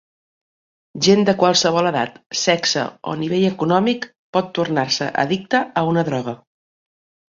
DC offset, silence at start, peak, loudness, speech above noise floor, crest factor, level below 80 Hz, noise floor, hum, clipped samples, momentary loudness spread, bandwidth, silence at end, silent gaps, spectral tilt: under 0.1%; 0.95 s; -2 dBFS; -19 LUFS; over 72 dB; 18 dB; -60 dBFS; under -90 dBFS; none; under 0.1%; 11 LU; 7.8 kHz; 0.95 s; 2.26-2.30 s, 4.19-4.33 s; -4 dB/octave